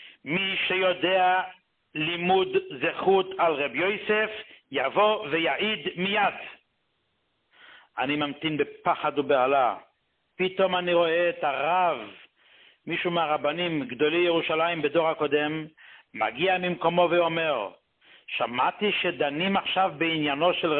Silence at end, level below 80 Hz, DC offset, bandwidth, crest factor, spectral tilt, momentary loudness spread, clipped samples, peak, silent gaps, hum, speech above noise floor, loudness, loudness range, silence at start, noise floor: 0 s; -68 dBFS; under 0.1%; 4.4 kHz; 18 dB; -9 dB/octave; 9 LU; under 0.1%; -8 dBFS; none; none; 49 dB; -25 LUFS; 3 LU; 0 s; -74 dBFS